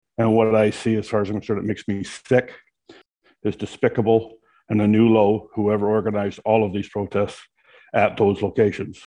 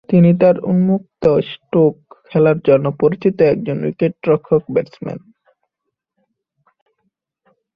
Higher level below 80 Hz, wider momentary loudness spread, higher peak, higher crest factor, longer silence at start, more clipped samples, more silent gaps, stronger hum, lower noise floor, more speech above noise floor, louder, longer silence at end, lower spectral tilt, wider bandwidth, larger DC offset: about the same, -56 dBFS vs -54 dBFS; about the same, 11 LU vs 9 LU; about the same, -4 dBFS vs -2 dBFS; about the same, 18 dB vs 16 dB; about the same, 0.2 s vs 0.1 s; neither; neither; neither; second, -54 dBFS vs -78 dBFS; second, 34 dB vs 63 dB; second, -21 LUFS vs -15 LUFS; second, 0.15 s vs 2.55 s; second, -7.5 dB/octave vs -10.5 dB/octave; first, 10.5 kHz vs 5.2 kHz; neither